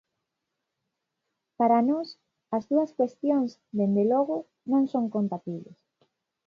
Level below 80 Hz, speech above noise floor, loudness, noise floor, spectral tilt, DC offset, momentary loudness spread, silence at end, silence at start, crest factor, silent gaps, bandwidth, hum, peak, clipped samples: -78 dBFS; 58 dB; -26 LUFS; -83 dBFS; -9 dB/octave; under 0.1%; 10 LU; 0.75 s; 1.6 s; 18 dB; none; 6.8 kHz; none; -10 dBFS; under 0.1%